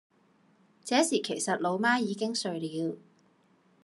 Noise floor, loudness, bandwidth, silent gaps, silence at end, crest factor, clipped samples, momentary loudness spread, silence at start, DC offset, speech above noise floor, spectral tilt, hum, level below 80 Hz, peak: -66 dBFS; -29 LUFS; 12.5 kHz; none; 0.85 s; 20 dB; under 0.1%; 10 LU; 0.85 s; under 0.1%; 37 dB; -3.5 dB/octave; none; -86 dBFS; -12 dBFS